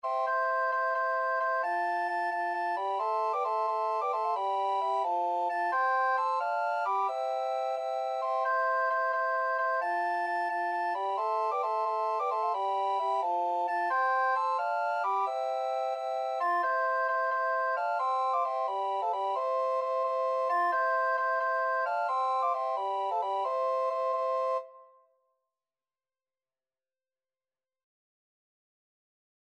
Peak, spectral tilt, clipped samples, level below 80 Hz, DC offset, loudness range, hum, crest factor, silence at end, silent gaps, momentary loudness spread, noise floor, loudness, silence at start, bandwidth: -18 dBFS; -0.5 dB/octave; under 0.1%; under -90 dBFS; under 0.1%; 2 LU; none; 12 dB; 4.6 s; none; 4 LU; under -90 dBFS; -30 LUFS; 0.05 s; 9.4 kHz